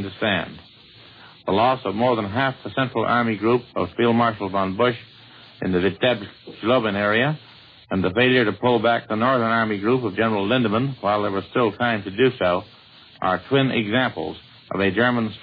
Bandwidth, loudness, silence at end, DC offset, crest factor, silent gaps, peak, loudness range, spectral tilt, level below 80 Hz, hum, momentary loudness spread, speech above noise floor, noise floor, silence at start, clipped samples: 5 kHz; -21 LUFS; 0 s; under 0.1%; 18 dB; none; -4 dBFS; 3 LU; -9 dB/octave; -58 dBFS; none; 9 LU; 26 dB; -47 dBFS; 0 s; under 0.1%